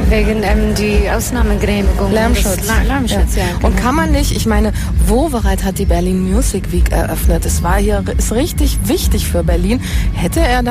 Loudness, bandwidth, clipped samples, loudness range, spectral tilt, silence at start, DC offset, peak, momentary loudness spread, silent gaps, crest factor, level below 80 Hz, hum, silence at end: -15 LUFS; 15.5 kHz; under 0.1%; 1 LU; -5.5 dB/octave; 0 s; under 0.1%; -2 dBFS; 3 LU; none; 12 dB; -16 dBFS; none; 0 s